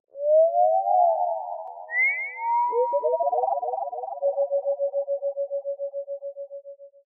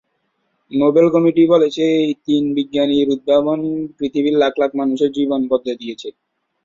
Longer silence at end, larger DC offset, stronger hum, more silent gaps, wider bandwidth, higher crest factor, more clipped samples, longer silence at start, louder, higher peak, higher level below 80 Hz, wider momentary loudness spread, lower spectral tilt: second, 0.2 s vs 0.55 s; neither; neither; neither; second, 2.5 kHz vs 7.6 kHz; about the same, 14 dB vs 14 dB; neither; second, 0.15 s vs 0.7 s; second, -24 LUFS vs -16 LUFS; second, -10 dBFS vs -2 dBFS; second, -88 dBFS vs -58 dBFS; first, 15 LU vs 11 LU; second, 11 dB/octave vs -6.5 dB/octave